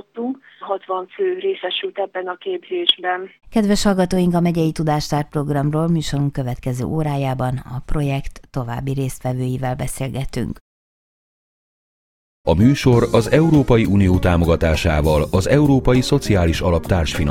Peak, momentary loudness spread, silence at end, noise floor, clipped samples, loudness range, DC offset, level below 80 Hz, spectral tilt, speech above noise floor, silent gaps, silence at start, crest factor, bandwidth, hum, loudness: 0 dBFS; 12 LU; 0 s; under -90 dBFS; under 0.1%; 10 LU; under 0.1%; -32 dBFS; -6.5 dB/octave; over 72 dB; 10.61-12.44 s; 0.15 s; 18 dB; 16.5 kHz; none; -19 LUFS